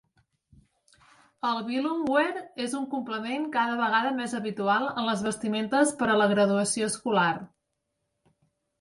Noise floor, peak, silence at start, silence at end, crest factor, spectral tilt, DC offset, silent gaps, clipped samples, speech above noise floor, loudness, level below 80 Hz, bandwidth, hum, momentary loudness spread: -80 dBFS; -10 dBFS; 1.45 s; 1.35 s; 18 dB; -4 dB/octave; under 0.1%; none; under 0.1%; 54 dB; -27 LUFS; -68 dBFS; 11.5 kHz; none; 8 LU